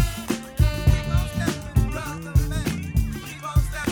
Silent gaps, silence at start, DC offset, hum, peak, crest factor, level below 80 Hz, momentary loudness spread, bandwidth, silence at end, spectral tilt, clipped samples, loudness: none; 0 s; under 0.1%; none; -6 dBFS; 16 dB; -26 dBFS; 8 LU; 20 kHz; 0 s; -6 dB/octave; under 0.1%; -25 LUFS